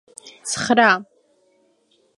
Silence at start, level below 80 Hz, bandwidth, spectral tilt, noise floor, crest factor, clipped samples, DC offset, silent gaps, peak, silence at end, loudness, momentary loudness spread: 0.25 s; -62 dBFS; 11.5 kHz; -2.5 dB/octave; -62 dBFS; 22 dB; under 0.1%; under 0.1%; none; -2 dBFS; 1.15 s; -18 LUFS; 19 LU